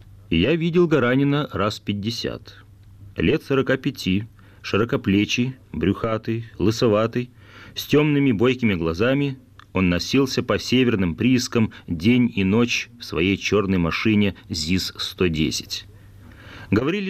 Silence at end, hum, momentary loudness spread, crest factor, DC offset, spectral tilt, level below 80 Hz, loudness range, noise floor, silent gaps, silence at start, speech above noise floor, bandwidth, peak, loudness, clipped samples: 0 s; none; 10 LU; 14 dB; under 0.1%; -5.5 dB/octave; -46 dBFS; 3 LU; -45 dBFS; none; 0.3 s; 24 dB; 15 kHz; -8 dBFS; -21 LUFS; under 0.1%